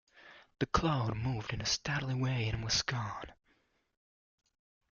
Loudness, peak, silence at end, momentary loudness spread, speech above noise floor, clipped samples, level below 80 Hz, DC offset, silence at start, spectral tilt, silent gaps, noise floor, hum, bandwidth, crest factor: -34 LUFS; -14 dBFS; 1.6 s; 8 LU; 40 dB; under 0.1%; -54 dBFS; under 0.1%; 0.15 s; -4 dB/octave; none; -74 dBFS; none; 7.2 kHz; 22 dB